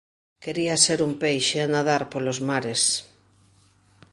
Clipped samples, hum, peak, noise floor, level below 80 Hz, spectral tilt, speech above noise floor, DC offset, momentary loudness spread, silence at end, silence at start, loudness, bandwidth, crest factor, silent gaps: under 0.1%; none; -4 dBFS; -59 dBFS; -64 dBFS; -3 dB/octave; 36 dB; under 0.1%; 9 LU; 1.1 s; 0.4 s; -23 LUFS; 11.5 kHz; 22 dB; none